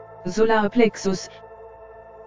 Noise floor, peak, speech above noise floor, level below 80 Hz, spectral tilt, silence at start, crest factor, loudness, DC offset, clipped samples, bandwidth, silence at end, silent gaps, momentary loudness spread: -43 dBFS; -4 dBFS; 23 dB; -54 dBFS; -5 dB/octave; 0 s; 18 dB; -21 LUFS; under 0.1%; under 0.1%; 7.6 kHz; 0 s; none; 24 LU